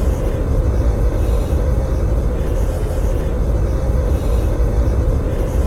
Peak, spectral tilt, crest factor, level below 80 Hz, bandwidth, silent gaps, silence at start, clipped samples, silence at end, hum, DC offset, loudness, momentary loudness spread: -6 dBFS; -8 dB/octave; 10 dB; -18 dBFS; 14 kHz; none; 0 s; under 0.1%; 0 s; none; under 0.1%; -19 LUFS; 2 LU